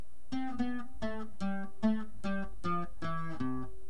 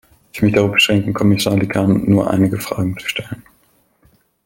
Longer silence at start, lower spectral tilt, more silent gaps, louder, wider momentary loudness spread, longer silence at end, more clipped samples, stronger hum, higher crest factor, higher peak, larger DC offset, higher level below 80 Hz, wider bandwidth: second, 0.15 s vs 0.35 s; first, -7 dB/octave vs -5.5 dB/octave; neither; second, -38 LUFS vs -16 LUFS; second, 7 LU vs 12 LU; second, 0 s vs 1.05 s; neither; neither; about the same, 18 dB vs 16 dB; second, -18 dBFS vs 0 dBFS; first, 2% vs under 0.1%; second, -54 dBFS vs -46 dBFS; second, 10.5 kHz vs 17 kHz